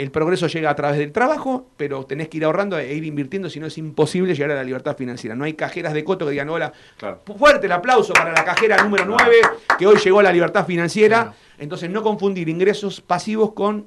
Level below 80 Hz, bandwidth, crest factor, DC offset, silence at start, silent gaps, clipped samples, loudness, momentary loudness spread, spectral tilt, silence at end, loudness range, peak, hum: -54 dBFS; 12 kHz; 14 dB; under 0.1%; 0 s; none; under 0.1%; -18 LUFS; 14 LU; -5 dB/octave; 0 s; 9 LU; -4 dBFS; none